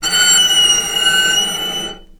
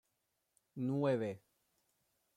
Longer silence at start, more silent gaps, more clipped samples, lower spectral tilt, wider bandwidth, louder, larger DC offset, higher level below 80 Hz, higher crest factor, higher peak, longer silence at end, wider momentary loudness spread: second, 0 s vs 0.75 s; neither; neither; second, 1.5 dB/octave vs -8.5 dB/octave; first, over 20 kHz vs 13.5 kHz; first, -11 LUFS vs -38 LUFS; neither; first, -42 dBFS vs -82 dBFS; about the same, 14 dB vs 18 dB; first, 0 dBFS vs -24 dBFS; second, 0.2 s vs 1 s; second, 11 LU vs 19 LU